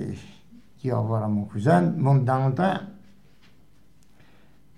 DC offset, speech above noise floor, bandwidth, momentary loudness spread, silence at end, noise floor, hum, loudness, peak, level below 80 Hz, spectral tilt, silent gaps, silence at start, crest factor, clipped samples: 0.3%; 37 dB; 10 kHz; 14 LU; 1.8 s; -59 dBFS; none; -24 LUFS; -8 dBFS; -64 dBFS; -9 dB/octave; none; 0 s; 18 dB; under 0.1%